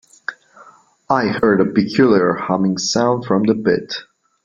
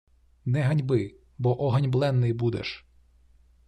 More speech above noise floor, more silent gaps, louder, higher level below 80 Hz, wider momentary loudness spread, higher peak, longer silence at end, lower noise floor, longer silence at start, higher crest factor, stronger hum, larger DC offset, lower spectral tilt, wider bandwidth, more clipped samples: about the same, 31 dB vs 34 dB; neither; first, -16 LUFS vs -26 LUFS; about the same, -54 dBFS vs -56 dBFS; first, 15 LU vs 12 LU; first, -2 dBFS vs -12 dBFS; second, 0.4 s vs 0.9 s; second, -47 dBFS vs -58 dBFS; second, 0.3 s vs 0.45 s; about the same, 16 dB vs 16 dB; neither; neither; second, -5.5 dB/octave vs -8.5 dB/octave; second, 7.6 kHz vs 9.2 kHz; neither